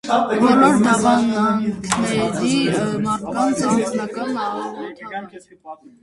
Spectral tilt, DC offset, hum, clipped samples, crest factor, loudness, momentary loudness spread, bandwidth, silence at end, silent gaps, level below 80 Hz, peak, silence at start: -5 dB/octave; under 0.1%; none; under 0.1%; 18 dB; -18 LUFS; 16 LU; 11.5 kHz; 0.15 s; none; -52 dBFS; 0 dBFS; 0.05 s